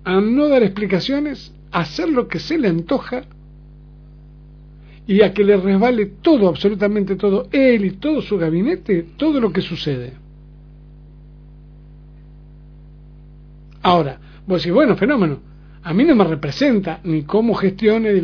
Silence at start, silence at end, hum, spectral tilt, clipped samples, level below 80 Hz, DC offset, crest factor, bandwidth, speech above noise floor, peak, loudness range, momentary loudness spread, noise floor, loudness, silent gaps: 0.05 s; 0 s; 50 Hz at -40 dBFS; -8 dB/octave; under 0.1%; -42 dBFS; under 0.1%; 18 dB; 5.4 kHz; 25 dB; 0 dBFS; 8 LU; 9 LU; -41 dBFS; -17 LUFS; none